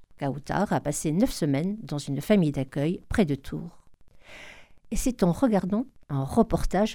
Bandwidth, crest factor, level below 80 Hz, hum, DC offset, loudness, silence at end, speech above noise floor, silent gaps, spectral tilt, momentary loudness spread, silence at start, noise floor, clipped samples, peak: 18 kHz; 18 dB; -40 dBFS; none; 0.2%; -27 LUFS; 0 s; 27 dB; none; -6.5 dB/octave; 14 LU; 0.2 s; -53 dBFS; under 0.1%; -8 dBFS